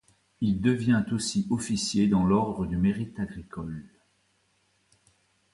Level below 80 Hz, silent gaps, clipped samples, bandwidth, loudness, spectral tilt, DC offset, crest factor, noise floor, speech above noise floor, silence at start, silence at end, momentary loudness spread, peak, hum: -50 dBFS; none; under 0.1%; 11.5 kHz; -27 LUFS; -5.5 dB/octave; under 0.1%; 18 dB; -70 dBFS; 43 dB; 0.4 s; 1.65 s; 14 LU; -10 dBFS; none